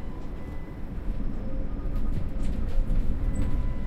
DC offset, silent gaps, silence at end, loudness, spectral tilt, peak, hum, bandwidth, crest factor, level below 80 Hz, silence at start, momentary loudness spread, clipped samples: under 0.1%; none; 0 s; -34 LUFS; -8 dB/octave; -12 dBFS; none; 8.4 kHz; 14 dB; -28 dBFS; 0 s; 8 LU; under 0.1%